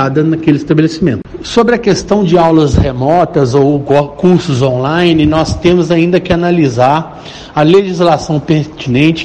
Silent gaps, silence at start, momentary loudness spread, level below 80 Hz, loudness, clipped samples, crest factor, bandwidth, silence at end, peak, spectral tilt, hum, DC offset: none; 0 s; 6 LU; -30 dBFS; -10 LUFS; under 0.1%; 10 dB; 9.2 kHz; 0 s; 0 dBFS; -7 dB/octave; none; 0.2%